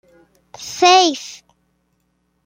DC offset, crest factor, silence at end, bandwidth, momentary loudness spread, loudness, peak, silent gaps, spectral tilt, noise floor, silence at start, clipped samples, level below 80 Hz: under 0.1%; 20 dB; 1.15 s; 16 kHz; 23 LU; -13 LUFS; 0 dBFS; none; -0.5 dB/octave; -66 dBFS; 0.6 s; under 0.1%; -66 dBFS